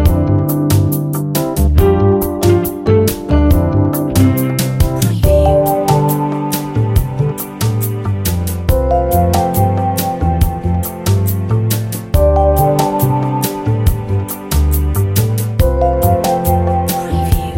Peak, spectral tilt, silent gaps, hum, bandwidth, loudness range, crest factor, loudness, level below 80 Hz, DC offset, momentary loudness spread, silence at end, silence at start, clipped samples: 0 dBFS; -6.5 dB/octave; none; none; 17 kHz; 2 LU; 12 dB; -14 LUFS; -20 dBFS; under 0.1%; 6 LU; 0 s; 0 s; under 0.1%